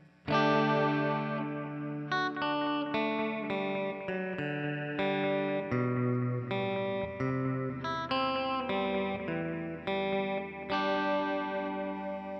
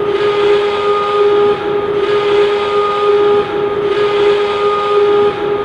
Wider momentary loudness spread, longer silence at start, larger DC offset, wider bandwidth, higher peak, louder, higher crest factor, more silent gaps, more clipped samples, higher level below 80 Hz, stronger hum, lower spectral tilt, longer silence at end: first, 7 LU vs 4 LU; first, 0.25 s vs 0 s; neither; second, 6.2 kHz vs 8.8 kHz; second, -14 dBFS vs -2 dBFS; second, -32 LUFS vs -13 LUFS; first, 18 dB vs 10 dB; neither; neither; second, -64 dBFS vs -46 dBFS; neither; first, -7.5 dB/octave vs -5.5 dB/octave; about the same, 0 s vs 0 s